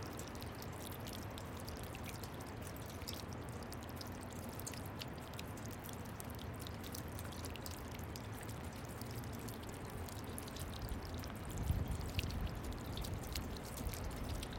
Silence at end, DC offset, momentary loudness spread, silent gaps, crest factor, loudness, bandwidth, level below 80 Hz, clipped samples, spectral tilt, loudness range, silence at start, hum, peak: 0 s; under 0.1%; 5 LU; none; 26 dB; -46 LUFS; 17 kHz; -52 dBFS; under 0.1%; -5 dB/octave; 3 LU; 0 s; none; -20 dBFS